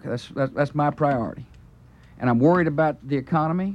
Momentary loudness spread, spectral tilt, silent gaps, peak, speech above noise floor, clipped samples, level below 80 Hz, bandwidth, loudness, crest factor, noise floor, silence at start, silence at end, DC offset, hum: 10 LU; -9 dB/octave; none; -8 dBFS; 27 dB; under 0.1%; -54 dBFS; 10 kHz; -23 LUFS; 14 dB; -49 dBFS; 0.05 s; 0 s; under 0.1%; none